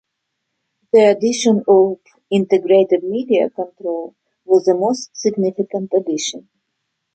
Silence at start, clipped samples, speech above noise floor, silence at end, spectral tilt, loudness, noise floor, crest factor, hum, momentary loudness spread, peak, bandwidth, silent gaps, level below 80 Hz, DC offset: 0.95 s; under 0.1%; 60 dB; 0.75 s; -5 dB/octave; -17 LUFS; -75 dBFS; 16 dB; none; 12 LU; -2 dBFS; 9 kHz; none; -66 dBFS; under 0.1%